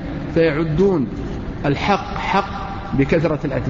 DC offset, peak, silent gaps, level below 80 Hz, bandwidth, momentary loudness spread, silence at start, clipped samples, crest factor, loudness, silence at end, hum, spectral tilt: under 0.1%; -6 dBFS; none; -34 dBFS; 7.6 kHz; 9 LU; 0 s; under 0.1%; 14 dB; -20 LUFS; 0 s; none; -7.5 dB/octave